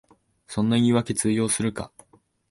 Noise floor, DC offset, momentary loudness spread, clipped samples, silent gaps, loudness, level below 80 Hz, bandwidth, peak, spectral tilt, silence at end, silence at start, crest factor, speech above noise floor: -60 dBFS; under 0.1%; 14 LU; under 0.1%; none; -23 LUFS; -54 dBFS; 11.5 kHz; -10 dBFS; -5 dB/octave; 0.65 s; 0.5 s; 16 dB; 37 dB